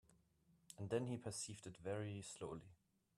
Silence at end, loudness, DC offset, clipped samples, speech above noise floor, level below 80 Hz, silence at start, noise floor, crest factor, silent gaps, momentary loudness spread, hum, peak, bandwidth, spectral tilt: 0.45 s; -48 LUFS; under 0.1%; under 0.1%; 29 dB; -78 dBFS; 0.1 s; -77 dBFS; 22 dB; none; 10 LU; none; -28 dBFS; 13 kHz; -5 dB/octave